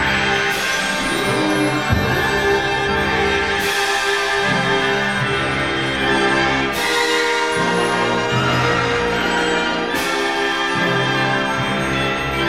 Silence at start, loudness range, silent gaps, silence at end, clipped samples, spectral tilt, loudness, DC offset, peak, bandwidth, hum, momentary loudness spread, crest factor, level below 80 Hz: 0 s; 1 LU; none; 0 s; under 0.1%; -4 dB/octave; -17 LUFS; 0.4%; -2 dBFS; 16 kHz; none; 2 LU; 16 dB; -38 dBFS